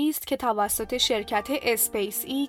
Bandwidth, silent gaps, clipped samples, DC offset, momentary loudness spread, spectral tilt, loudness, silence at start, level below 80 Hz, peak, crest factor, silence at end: 18 kHz; none; under 0.1%; under 0.1%; 4 LU; -2 dB/octave; -25 LUFS; 0 s; -54 dBFS; -8 dBFS; 18 dB; 0 s